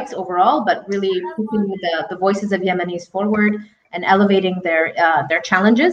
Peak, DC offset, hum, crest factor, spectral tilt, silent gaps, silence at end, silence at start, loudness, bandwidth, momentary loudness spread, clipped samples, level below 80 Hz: -2 dBFS; under 0.1%; none; 16 dB; -6 dB/octave; none; 0 s; 0 s; -18 LUFS; 7.8 kHz; 8 LU; under 0.1%; -62 dBFS